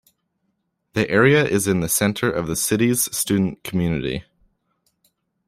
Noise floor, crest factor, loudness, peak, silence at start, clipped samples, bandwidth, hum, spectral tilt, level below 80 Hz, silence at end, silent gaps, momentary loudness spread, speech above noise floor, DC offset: -72 dBFS; 20 dB; -20 LUFS; -2 dBFS; 0.95 s; under 0.1%; 16 kHz; none; -4.5 dB/octave; -50 dBFS; 1.25 s; none; 9 LU; 53 dB; under 0.1%